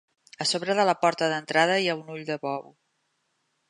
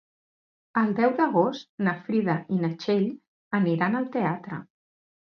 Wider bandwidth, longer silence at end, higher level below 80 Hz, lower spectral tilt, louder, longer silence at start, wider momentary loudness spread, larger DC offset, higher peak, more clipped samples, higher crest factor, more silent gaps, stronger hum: first, 11.5 kHz vs 6.6 kHz; first, 1.1 s vs 0.75 s; second, -80 dBFS vs -72 dBFS; second, -3.5 dB/octave vs -8.5 dB/octave; about the same, -25 LUFS vs -26 LUFS; second, 0.4 s vs 0.75 s; first, 11 LU vs 8 LU; neither; about the same, -6 dBFS vs -8 dBFS; neither; about the same, 20 dB vs 18 dB; second, none vs 1.69-1.78 s, 3.27-3.51 s; neither